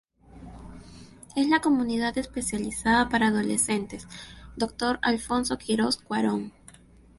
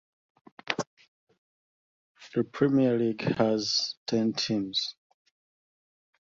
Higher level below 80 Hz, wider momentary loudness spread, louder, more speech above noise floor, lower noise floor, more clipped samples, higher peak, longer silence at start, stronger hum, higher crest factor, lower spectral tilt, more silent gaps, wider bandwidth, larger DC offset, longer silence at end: first, -50 dBFS vs -68 dBFS; first, 21 LU vs 9 LU; about the same, -26 LUFS vs -28 LUFS; second, 27 dB vs over 63 dB; second, -53 dBFS vs under -90 dBFS; neither; second, -8 dBFS vs -4 dBFS; second, 0.35 s vs 0.7 s; neither; second, 20 dB vs 26 dB; second, -3.5 dB/octave vs -5 dB/octave; second, none vs 0.87-0.97 s, 1.08-1.27 s, 1.38-2.15 s, 3.97-4.06 s; first, 11.5 kHz vs 7.6 kHz; neither; second, 0.7 s vs 1.3 s